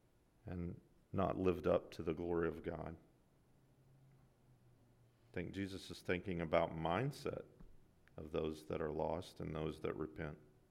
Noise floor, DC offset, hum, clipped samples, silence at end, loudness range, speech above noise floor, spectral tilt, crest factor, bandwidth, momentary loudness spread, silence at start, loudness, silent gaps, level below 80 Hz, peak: -71 dBFS; under 0.1%; none; under 0.1%; 0.25 s; 8 LU; 30 dB; -7 dB/octave; 22 dB; 16 kHz; 14 LU; 0.45 s; -42 LUFS; none; -64 dBFS; -20 dBFS